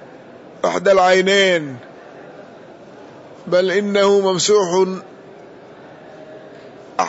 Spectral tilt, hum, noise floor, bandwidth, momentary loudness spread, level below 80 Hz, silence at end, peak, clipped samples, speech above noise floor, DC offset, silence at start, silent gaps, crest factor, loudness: -3.5 dB/octave; none; -40 dBFS; 8 kHz; 26 LU; -62 dBFS; 0 s; -4 dBFS; under 0.1%; 25 dB; under 0.1%; 0.15 s; none; 16 dB; -15 LUFS